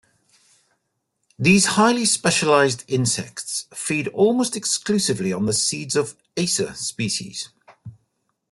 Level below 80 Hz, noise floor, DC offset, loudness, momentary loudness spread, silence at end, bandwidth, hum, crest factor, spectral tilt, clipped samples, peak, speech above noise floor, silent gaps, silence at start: -60 dBFS; -74 dBFS; under 0.1%; -20 LUFS; 11 LU; 0.6 s; 12.5 kHz; none; 18 dB; -3.5 dB/octave; under 0.1%; -4 dBFS; 54 dB; none; 1.4 s